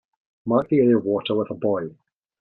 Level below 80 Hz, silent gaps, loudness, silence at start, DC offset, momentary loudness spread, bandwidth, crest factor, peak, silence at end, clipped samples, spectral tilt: -64 dBFS; none; -22 LUFS; 0.45 s; under 0.1%; 12 LU; 4.2 kHz; 18 dB; -4 dBFS; 0.5 s; under 0.1%; -10 dB/octave